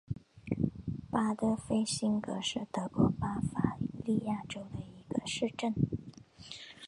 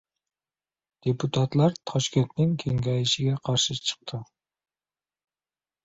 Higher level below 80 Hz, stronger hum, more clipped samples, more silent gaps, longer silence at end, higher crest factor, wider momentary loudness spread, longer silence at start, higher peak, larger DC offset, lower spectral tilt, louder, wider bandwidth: about the same, -56 dBFS vs -58 dBFS; neither; neither; neither; second, 0 s vs 1.6 s; about the same, 20 dB vs 20 dB; first, 14 LU vs 8 LU; second, 0.1 s vs 1.05 s; second, -14 dBFS vs -8 dBFS; neither; about the same, -5.5 dB/octave vs -5 dB/octave; second, -34 LUFS vs -26 LUFS; first, 11.5 kHz vs 8 kHz